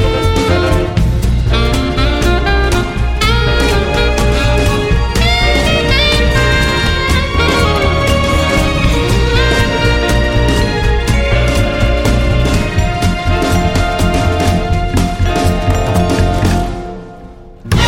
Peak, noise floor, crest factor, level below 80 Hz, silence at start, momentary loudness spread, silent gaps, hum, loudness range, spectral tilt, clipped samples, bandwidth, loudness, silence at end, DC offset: 0 dBFS; -33 dBFS; 12 dB; -16 dBFS; 0 s; 3 LU; none; none; 2 LU; -5 dB/octave; under 0.1%; 16.5 kHz; -13 LUFS; 0 s; under 0.1%